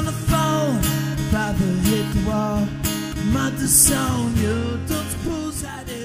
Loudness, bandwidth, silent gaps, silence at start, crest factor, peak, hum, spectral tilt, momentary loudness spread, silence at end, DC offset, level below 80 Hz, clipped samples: -20 LUFS; 16 kHz; none; 0 s; 20 dB; -2 dBFS; none; -4.5 dB/octave; 11 LU; 0 s; under 0.1%; -34 dBFS; under 0.1%